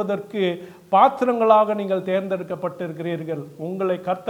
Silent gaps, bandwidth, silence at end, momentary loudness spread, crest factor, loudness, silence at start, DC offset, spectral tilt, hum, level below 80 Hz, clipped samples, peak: none; 18 kHz; 0 s; 13 LU; 20 dB; -22 LUFS; 0 s; under 0.1%; -7.5 dB/octave; none; -72 dBFS; under 0.1%; -2 dBFS